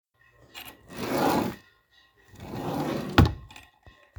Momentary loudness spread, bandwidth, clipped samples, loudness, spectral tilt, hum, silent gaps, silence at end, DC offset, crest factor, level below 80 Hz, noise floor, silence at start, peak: 24 LU; over 20 kHz; under 0.1%; -27 LUFS; -6 dB/octave; none; none; 0.3 s; under 0.1%; 28 dB; -44 dBFS; -62 dBFS; 0.55 s; 0 dBFS